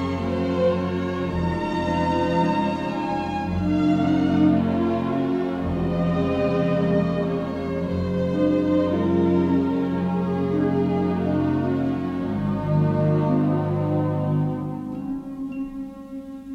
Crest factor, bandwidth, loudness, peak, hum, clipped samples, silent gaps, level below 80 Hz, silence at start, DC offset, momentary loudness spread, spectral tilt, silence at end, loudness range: 14 dB; 8 kHz; -23 LUFS; -8 dBFS; none; under 0.1%; none; -44 dBFS; 0 s; under 0.1%; 9 LU; -9 dB/octave; 0 s; 2 LU